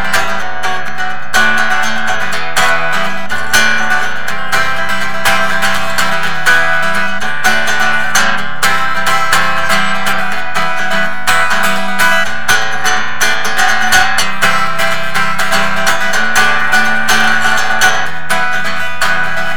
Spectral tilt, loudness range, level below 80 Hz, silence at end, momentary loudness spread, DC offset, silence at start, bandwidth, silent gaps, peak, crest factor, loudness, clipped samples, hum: -1.5 dB/octave; 2 LU; -42 dBFS; 0 s; 6 LU; 30%; 0 s; over 20 kHz; none; 0 dBFS; 16 dB; -12 LUFS; under 0.1%; none